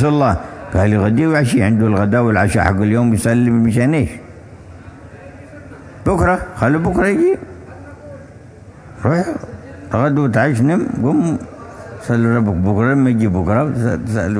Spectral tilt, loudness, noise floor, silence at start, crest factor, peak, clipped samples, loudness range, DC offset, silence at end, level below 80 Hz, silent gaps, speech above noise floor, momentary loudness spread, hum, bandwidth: -7.5 dB/octave; -15 LUFS; -38 dBFS; 0 s; 16 dB; 0 dBFS; under 0.1%; 6 LU; under 0.1%; 0 s; -36 dBFS; none; 24 dB; 21 LU; none; 11 kHz